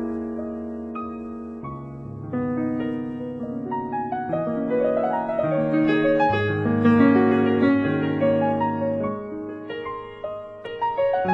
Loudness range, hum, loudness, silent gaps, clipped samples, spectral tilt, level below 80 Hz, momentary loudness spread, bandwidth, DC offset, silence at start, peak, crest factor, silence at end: 10 LU; none; -23 LUFS; none; under 0.1%; -9 dB/octave; -54 dBFS; 15 LU; 5.6 kHz; under 0.1%; 0 s; -6 dBFS; 18 dB; 0 s